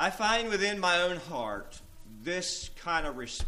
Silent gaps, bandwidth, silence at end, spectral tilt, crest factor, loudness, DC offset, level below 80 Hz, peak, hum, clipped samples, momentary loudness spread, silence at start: none; 15.5 kHz; 0 s; -2.5 dB/octave; 20 dB; -30 LUFS; under 0.1%; -48 dBFS; -12 dBFS; none; under 0.1%; 12 LU; 0 s